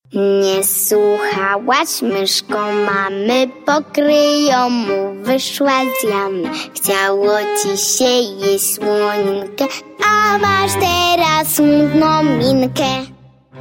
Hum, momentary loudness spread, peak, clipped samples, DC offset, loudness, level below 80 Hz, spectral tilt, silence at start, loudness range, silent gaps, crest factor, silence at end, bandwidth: none; 7 LU; -4 dBFS; under 0.1%; under 0.1%; -15 LUFS; -50 dBFS; -3 dB/octave; 0.1 s; 2 LU; none; 12 dB; 0 s; 16.5 kHz